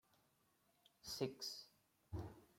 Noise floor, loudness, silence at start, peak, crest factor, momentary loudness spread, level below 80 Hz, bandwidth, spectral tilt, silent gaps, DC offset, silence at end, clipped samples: -80 dBFS; -50 LUFS; 1.05 s; -28 dBFS; 24 dB; 12 LU; -70 dBFS; 16.5 kHz; -4.5 dB/octave; none; under 0.1%; 0.1 s; under 0.1%